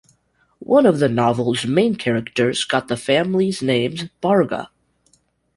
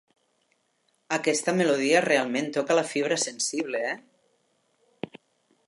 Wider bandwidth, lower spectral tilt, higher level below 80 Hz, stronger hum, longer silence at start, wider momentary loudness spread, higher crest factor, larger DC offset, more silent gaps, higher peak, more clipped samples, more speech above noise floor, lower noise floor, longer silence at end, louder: about the same, 11.5 kHz vs 11.5 kHz; first, -5.5 dB/octave vs -3 dB/octave; first, -56 dBFS vs -80 dBFS; first, 60 Hz at -45 dBFS vs none; second, 0.6 s vs 1.1 s; second, 8 LU vs 18 LU; about the same, 16 dB vs 20 dB; neither; neither; first, -2 dBFS vs -6 dBFS; neither; about the same, 44 dB vs 46 dB; second, -62 dBFS vs -71 dBFS; second, 0.9 s vs 1.7 s; first, -19 LUFS vs -25 LUFS